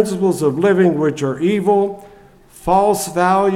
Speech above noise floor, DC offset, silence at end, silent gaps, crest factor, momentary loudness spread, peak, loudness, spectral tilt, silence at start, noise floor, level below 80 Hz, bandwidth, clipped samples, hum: 29 dB; under 0.1%; 0 s; none; 16 dB; 6 LU; 0 dBFS; -16 LUFS; -6 dB/octave; 0 s; -44 dBFS; -46 dBFS; 16 kHz; under 0.1%; none